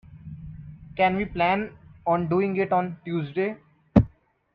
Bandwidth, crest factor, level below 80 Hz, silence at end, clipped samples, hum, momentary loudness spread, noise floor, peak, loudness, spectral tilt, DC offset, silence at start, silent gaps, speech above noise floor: 5.6 kHz; 24 dB; -44 dBFS; 0.45 s; under 0.1%; none; 19 LU; -49 dBFS; -2 dBFS; -25 LUFS; -9.5 dB/octave; under 0.1%; 0.1 s; none; 25 dB